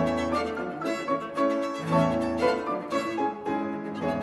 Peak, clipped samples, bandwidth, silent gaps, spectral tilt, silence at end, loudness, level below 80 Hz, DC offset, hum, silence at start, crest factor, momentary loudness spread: -12 dBFS; under 0.1%; 12.5 kHz; none; -6.5 dB/octave; 0 s; -28 LUFS; -52 dBFS; under 0.1%; none; 0 s; 16 dB; 6 LU